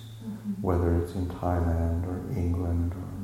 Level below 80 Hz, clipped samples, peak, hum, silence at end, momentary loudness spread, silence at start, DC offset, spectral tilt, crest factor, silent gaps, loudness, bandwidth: -38 dBFS; under 0.1%; -12 dBFS; none; 0 s; 7 LU; 0 s; under 0.1%; -9 dB/octave; 16 dB; none; -29 LUFS; 13 kHz